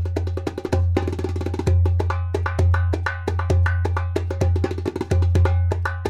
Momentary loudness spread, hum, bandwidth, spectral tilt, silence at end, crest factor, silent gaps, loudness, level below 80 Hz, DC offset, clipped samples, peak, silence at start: 6 LU; none; 7.8 kHz; -7.5 dB/octave; 0 s; 12 dB; none; -22 LUFS; -30 dBFS; under 0.1%; under 0.1%; -8 dBFS; 0 s